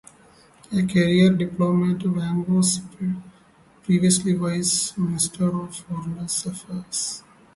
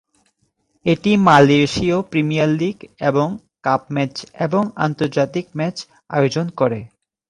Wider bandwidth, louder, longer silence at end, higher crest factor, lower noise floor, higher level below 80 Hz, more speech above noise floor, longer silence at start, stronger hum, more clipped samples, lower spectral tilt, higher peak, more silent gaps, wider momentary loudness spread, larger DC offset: about the same, 11.5 kHz vs 11 kHz; second, -22 LUFS vs -18 LUFS; about the same, 0.35 s vs 0.45 s; about the same, 18 dB vs 18 dB; second, -54 dBFS vs -66 dBFS; second, -56 dBFS vs -50 dBFS; second, 32 dB vs 49 dB; second, 0.7 s vs 0.85 s; neither; neither; second, -5 dB/octave vs -6.5 dB/octave; second, -6 dBFS vs 0 dBFS; neither; about the same, 13 LU vs 12 LU; neither